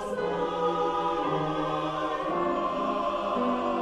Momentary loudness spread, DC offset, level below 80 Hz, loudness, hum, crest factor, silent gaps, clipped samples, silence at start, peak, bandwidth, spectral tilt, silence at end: 2 LU; under 0.1%; -54 dBFS; -28 LUFS; none; 12 dB; none; under 0.1%; 0 s; -16 dBFS; 11.5 kHz; -6 dB/octave; 0 s